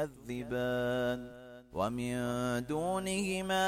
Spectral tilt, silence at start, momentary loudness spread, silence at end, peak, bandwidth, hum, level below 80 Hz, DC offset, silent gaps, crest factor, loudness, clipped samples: -5 dB/octave; 0 s; 9 LU; 0 s; -20 dBFS; 16.5 kHz; none; -58 dBFS; under 0.1%; none; 14 dB; -35 LUFS; under 0.1%